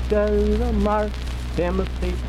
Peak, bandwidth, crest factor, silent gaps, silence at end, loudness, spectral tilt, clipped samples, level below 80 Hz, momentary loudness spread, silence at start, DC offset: -8 dBFS; 12 kHz; 12 dB; none; 0 s; -23 LUFS; -7.5 dB/octave; under 0.1%; -26 dBFS; 7 LU; 0 s; under 0.1%